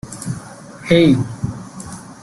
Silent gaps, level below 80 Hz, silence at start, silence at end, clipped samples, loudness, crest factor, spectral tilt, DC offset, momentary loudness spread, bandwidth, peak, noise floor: none; -46 dBFS; 0.05 s; 0.1 s; under 0.1%; -17 LUFS; 18 dB; -6 dB/octave; under 0.1%; 20 LU; 12.5 kHz; -2 dBFS; -35 dBFS